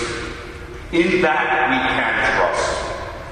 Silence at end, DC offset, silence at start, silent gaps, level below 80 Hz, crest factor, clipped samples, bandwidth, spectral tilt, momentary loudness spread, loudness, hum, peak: 0 s; under 0.1%; 0 s; none; -38 dBFS; 14 dB; under 0.1%; 11 kHz; -4 dB/octave; 14 LU; -18 LUFS; none; -6 dBFS